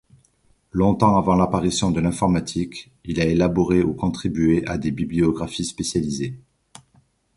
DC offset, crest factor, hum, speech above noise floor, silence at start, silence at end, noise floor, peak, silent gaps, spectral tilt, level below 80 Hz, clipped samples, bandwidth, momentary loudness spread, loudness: under 0.1%; 20 dB; none; 41 dB; 0.75 s; 1 s; -61 dBFS; -2 dBFS; none; -6 dB/octave; -40 dBFS; under 0.1%; 11.5 kHz; 10 LU; -21 LUFS